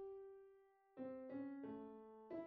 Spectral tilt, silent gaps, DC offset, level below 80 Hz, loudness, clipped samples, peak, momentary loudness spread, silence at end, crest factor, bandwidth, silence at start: -7 dB/octave; none; under 0.1%; -86 dBFS; -54 LUFS; under 0.1%; -40 dBFS; 13 LU; 0 s; 14 dB; 4.7 kHz; 0 s